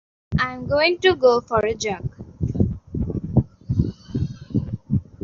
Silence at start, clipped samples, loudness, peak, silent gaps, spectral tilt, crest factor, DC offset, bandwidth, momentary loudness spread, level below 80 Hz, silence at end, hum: 0.3 s; under 0.1%; -22 LUFS; -4 dBFS; none; -5 dB/octave; 18 dB; under 0.1%; 7.4 kHz; 11 LU; -38 dBFS; 0.2 s; none